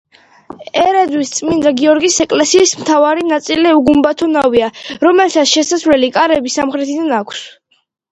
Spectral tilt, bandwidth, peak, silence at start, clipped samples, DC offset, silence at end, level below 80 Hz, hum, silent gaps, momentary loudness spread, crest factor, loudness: -2.5 dB/octave; 10.5 kHz; 0 dBFS; 0.6 s; under 0.1%; under 0.1%; 0.6 s; -48 dBFS; none; none; 7 LU; 12 dB; -12 LUFS